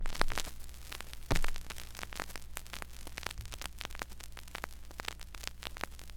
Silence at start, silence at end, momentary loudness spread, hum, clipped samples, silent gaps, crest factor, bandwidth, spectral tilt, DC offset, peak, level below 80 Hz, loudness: 0 s; 0 s; 10 LU; none; under 0.1%; none; 32 dB; 18 kHz; -3 dB/octave; 0.3%; -4 dBFS; -40 dBFS; -42 LUFS